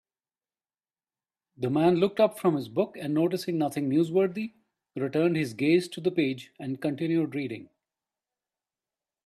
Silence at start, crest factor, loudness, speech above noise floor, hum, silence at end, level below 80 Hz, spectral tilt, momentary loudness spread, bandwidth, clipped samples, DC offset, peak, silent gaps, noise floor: 1.6 s; 18 dB; -27 LUFS; over 64 dB; none; 1.6 s; -72 dBFS; -7 dB/octave; 12 LU; 14 kHz; under 0.1%; under 0.1%; -10 dBFS; none; under -90 dBFS